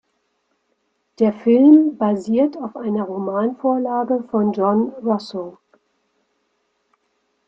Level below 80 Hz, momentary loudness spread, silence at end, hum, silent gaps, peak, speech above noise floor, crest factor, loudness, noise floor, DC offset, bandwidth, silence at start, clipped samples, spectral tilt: -66 dBFS; 12 LU; 1.95 s; none; none; -2 dBFS; 52 dB; 18 dB; -18 LUFS; -69 dBFS; under 0.1%; 7.4 kHz; 1.2 s; under 0.1%; -8.5 dB/octave